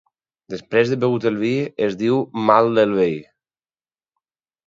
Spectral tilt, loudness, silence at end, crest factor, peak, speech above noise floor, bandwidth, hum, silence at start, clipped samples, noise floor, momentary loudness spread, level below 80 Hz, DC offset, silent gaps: -7 dB/octave; -19 LUFS; 1.45 s; 20 dB; 0 dBFS; over 72 dB; 7.6 kHz; none; 0.5 s; under 0.1%; under -90 dBFS; 9 LU; -62 dBFS; under 0.1%; none